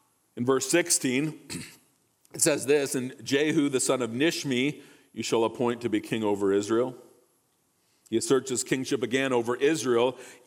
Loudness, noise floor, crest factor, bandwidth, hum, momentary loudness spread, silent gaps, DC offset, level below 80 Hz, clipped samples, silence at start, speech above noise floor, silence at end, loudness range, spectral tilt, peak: -26 LUFS; -70 dBFS; 18 dB; 18 kHz; none; 10 LU; none; under 0.1%; -72 dBFS; under 0.1%; 0.35 s; 44 dB; 0.1 s; 2 LU; -3.5 dB/octave; -8 dBFS